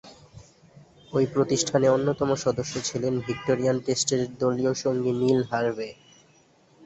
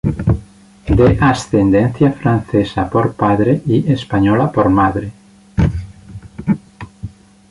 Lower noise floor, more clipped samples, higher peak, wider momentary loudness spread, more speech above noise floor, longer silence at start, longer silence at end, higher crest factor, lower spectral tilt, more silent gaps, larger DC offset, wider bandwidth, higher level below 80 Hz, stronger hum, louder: first, -59 dBFS vs -39 dBFS; neither; second, -8 dBFS vs 0 dBFS; second, 7 LU vs 19 LU; first, 35 dB vs 26 dB; about the same, 0.05 s vs 0.05 s; second, 0 s vs 0.4 s; about the same, 18 dB vs 14 dB; second, -5 dB/octave vs -8 dB/octave; neither; neither; second, 8.2 kHz vs 11.5 kHz; second, -58 dBFS vs -30 dBFS; neither; second, -25 LUFS vs -15 LUFS